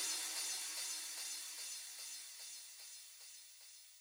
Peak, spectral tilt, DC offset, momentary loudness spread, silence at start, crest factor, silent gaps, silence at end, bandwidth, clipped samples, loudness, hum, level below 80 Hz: -28 dBFS; 4.5 dB/octave; under 0.1%; 15 LU; 0 s; 18 dB; none; 0 s; over 20 kHz; under 0.1%; -44 LUFS; none; under -90 dBFS